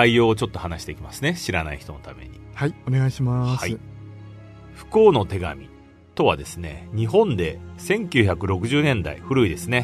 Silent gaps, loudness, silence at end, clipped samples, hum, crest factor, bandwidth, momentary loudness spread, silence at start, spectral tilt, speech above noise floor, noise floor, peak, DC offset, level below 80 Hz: none; -22 LUFS; 0 s; under 0.1%; none; 22 dB; 13.5 kHz; 21 LU; 0 s; -6 dB/octave; 20 dB; -42 dBFS; 0 dBFS; under 0.1%; -44 dBFS